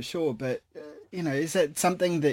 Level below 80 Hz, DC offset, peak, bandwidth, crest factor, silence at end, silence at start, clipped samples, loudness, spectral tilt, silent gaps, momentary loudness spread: -66 dBFS; under 0.1%; -14 dBFS; 17 kHz; 14 dB; 0 s; 0 s; under 0.1%; -28 LUFS; -4.5 dB/octave; none; 15 LU